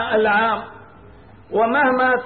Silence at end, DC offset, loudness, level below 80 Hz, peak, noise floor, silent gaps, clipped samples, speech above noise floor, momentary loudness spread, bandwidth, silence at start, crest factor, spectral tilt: 0 s; 0.2%; -18 LUFS; -54 dBFS; -8 dBFS; -45 dBFS; none; under 0.1%; 27 dB; 10 LU; 4.6 kHz; 0 s; 12 dB; -9.5 dB/octave